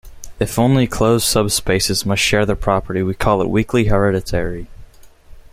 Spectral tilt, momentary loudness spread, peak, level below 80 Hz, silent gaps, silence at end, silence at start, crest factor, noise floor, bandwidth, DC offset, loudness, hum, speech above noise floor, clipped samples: -4.5 dB/octave; 7 LU; -2 dBFS; -32 dBFS; none; 0.15 s; 0.05 s; 16 dB; -41 dBFS; 16.5 kHz; under 0.1%; -17 LUFS; none; 25 dB; under 0.1%